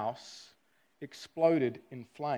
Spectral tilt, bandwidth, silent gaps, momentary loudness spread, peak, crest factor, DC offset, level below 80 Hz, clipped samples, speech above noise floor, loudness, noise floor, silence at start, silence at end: -6.5 dB/octave; 12.5 kHz; none; 21 LU; -14 dBFS; 20 dB; under 0.1%; -82 dBFS; under 0.1%; 39 dB; -31 LUFS; -72 dBFS; 0 s; 0 s